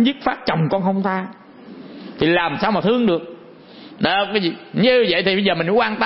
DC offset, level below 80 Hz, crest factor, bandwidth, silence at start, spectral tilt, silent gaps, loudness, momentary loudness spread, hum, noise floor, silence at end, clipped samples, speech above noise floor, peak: under 0.1%; -52 dBFS; 16 dB; 5.8 kHz; 0 s; -10 dB/octave; none; -18 LUFS; 18 LU; none; -41 dBFS; 0 s; under 0.1%; 23 dB; -2 dBFS